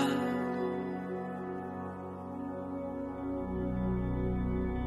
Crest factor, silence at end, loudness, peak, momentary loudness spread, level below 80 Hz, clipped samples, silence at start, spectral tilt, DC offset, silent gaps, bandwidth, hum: 16 dB; 0 s; -36 LUFS; -18 dBFS; 7 LU; -44 dBFS; under 0.1%; 0 s; -7.5 dB/octave; under 0.1%; none; 12.5 kHz; none